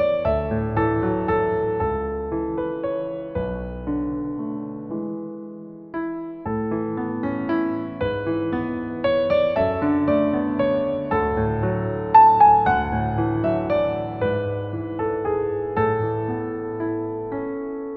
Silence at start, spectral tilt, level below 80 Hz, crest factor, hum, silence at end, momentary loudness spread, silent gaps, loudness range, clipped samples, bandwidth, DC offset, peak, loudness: 0 s; -10.5 dB/octave; -42 dBFS; 20 dB; none; 0 s; 10 LU; none; 10 LU; under 0.1%; 5.6 kHz; under 0.1%; -2 dBFS; -23 LUFS